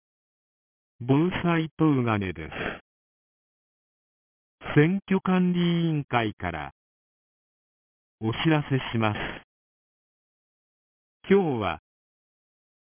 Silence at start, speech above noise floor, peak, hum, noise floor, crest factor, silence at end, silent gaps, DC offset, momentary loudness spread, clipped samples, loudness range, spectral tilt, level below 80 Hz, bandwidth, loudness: 1 s; over 66 dB; -8 dBFS; none; under -90 dBFS; 20 dB; 1.1 s; 1.71-1.77 s, 2.81-4.58 s, 6.04-6.08 s, 6.33-6.37 s, 6.72-8.18 s, 9.44-11.20 s; under 0.1%; 13 LU; under 0.1%; 4 LU; -11 dB/octave; -54 dBFS; 3.6 kHz; -25 LUFS